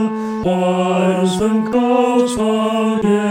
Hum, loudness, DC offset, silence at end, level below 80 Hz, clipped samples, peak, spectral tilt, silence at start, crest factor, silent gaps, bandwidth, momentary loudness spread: none; -16 LUFS; under 0.1%; 0 s; -48 dBFS; under 0.1%; -4 dBFS; -6 dB/octave; 0 s; 12 dB; none; 15.5 kHz; 3 LU